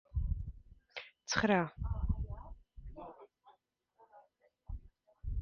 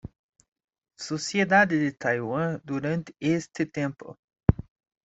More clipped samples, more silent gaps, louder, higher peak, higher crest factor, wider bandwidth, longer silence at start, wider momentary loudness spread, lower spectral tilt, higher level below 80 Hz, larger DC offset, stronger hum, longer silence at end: neither; second, none vs 0.19-0.33 s, 0.48-0.52 s, 0.64-0.68 s, 4.19-4.28 s; second, -37 LUFS vs -26 LUFS; second, -16 dBFS vs -4 dBFS; about the same, 24 dB vs 24 dB; second, 7.2 kHz vs 8.2 kHz; about the same, 0.15 s vs 0.05 s; first, 23 LU vs 15 LU; second, -4.5 dB/octave vs -6 dB/octave; about the same, -44 dBFS vs -46 dBFS; neither; neither; second, 0 s vs 0.45 s